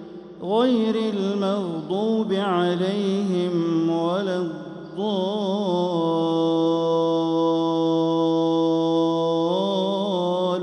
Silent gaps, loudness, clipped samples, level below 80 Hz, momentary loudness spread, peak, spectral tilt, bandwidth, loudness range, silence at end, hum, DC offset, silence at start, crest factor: none; -22 LUFS; under 0.1%; -66 dBFS; 5 LU; -8 dBFS; -7 dB/octave; 9.8 kHz; 3 LU; 0 s; none; under 0.1%; 0 s; 14 dB